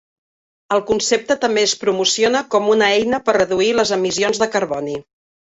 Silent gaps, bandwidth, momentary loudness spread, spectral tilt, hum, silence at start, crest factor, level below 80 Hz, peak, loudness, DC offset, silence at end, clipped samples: none; 8 kHz; 6 LU; -2.5 dB/octave; none; 0.7 s; 16 dB; -54 dBFS; -2 dBFS; -17 LUFS; under 0.1%; 0.55 s; under 0.1%